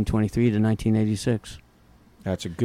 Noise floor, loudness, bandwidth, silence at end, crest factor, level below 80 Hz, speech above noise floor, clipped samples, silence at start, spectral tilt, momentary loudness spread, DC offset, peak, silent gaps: -55 dBFS; -24 LUFS; 13.5 kHz; 0 s; 14 dB; -42 dBFS; 32 dB; under 0.1%; 0 s; -7 dB/octave; 11 LU; under 0.1%; -10 dBFS; none